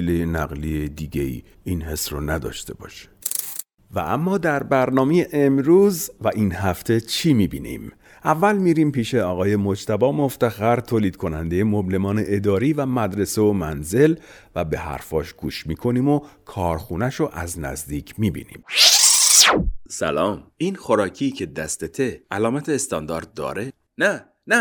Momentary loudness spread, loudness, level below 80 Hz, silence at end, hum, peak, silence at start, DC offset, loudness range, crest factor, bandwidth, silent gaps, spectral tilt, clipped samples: 14 LU; -20 LUFS; -40 dBFS; 0 s; none; -2 dBFS; 0 s; under 0.1%; 9 LU; 20 dB; over 20 kHz; none; -3.5 dB/octave; under 0.1%